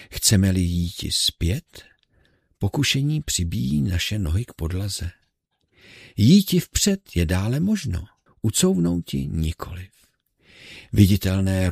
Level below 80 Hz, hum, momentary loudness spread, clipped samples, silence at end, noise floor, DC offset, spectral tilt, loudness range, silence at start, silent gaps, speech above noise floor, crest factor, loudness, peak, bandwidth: -38 dBFS; none; 13 LU; under 0.1%; 0 s; -71 dBFS; under 0.1%; -5 dB/octave; 4 LU; 0 s; none; 50 dB; 22 dB; -22 LUFS; 0 dBFS; 15.5 kHz